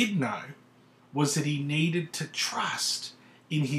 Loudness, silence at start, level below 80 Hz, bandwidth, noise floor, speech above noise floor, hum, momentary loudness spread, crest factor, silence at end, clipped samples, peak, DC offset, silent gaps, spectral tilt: -29 LUFS; 0 s; -78 dBFS; 15 kHz; -59 dBFS; 30 dB; none; 10 LU; 18 dB; 0 s; under 0.1%; -12 dBFS; under 0.1%; none; -4 dB/octave